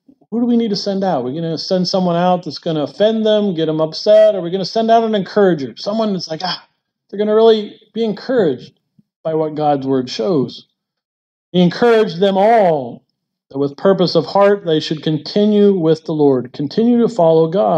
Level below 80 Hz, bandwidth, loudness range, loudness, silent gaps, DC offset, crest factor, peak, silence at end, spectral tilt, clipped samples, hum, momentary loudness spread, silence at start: -66 dBFS; 8.2 kHz; 4 LU; -15 LUFS; 9.16-9.24 s, 11.05-11.52 s; under 0.1%; 14 dB; -2 dBFS; 0 s; -7 dB/octave; under 0.1%; none; 10 LU; 0.3 s